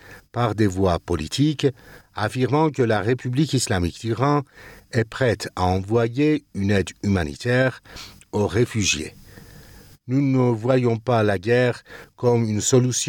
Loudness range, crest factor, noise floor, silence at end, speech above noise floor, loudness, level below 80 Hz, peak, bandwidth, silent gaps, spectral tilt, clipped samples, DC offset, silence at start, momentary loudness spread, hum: 2 LU; 16 dB; -46 dBFS; 0 s; 25 dB; -22 LUFS; -46 dBFS; -6 dBFS; 18 kHz; none; -5.5 dB/octave; under 0.1%; under 0.1%; 0.05 s; 7 LU; none